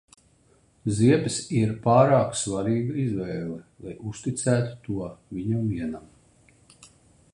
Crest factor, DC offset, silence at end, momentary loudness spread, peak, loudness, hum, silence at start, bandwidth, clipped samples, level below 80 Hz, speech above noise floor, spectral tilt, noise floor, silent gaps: 22 dB; under 0.1%; 0.5 s; 16 LU; -4 dBFS; -25 LUFS; none; 0.85 s; 11 kHz; under 0.1%; -54 dBFS; 37 dB; -6 dB/octave; -61 dBFS; none